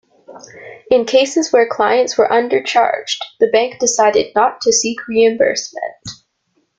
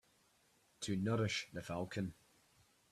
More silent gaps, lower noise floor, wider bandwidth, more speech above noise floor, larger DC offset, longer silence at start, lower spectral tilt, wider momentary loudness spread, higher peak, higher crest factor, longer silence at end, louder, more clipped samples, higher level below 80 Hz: neither; second, -65 dBFS vs -74 dBFS; second, 9.4 kHz vs 13.5 kHz; first, 50 dB vs 34 dB; neither; second, 0.3 s vs 0.8 s; second, -2 dB/octave vs -5 dB/octave; first, 13 LU vs 9 LU; first, -2 dBFS vs -26 dBFS; about the same, 14 dB vs 16 dB; second, 0.65 s vs 0.8 s; first, -14 LUFS vs -41 LUFS; neither; first, -58 dBFS vs -72 dBFS